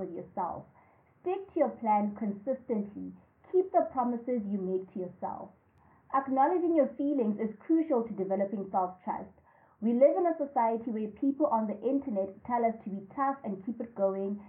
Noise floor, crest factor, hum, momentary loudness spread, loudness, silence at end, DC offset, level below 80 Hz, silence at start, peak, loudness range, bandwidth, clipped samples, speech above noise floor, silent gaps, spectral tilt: -63 dBFS; 18 dB; none; 13 LU; -31 LUFS; 0 s; under 0.1%; -74 dBFS; 0 s; -12 dBFS; 3 LU; 3.5 kHz; under 0.1%; 33 dB; none; -11.5 dB/octave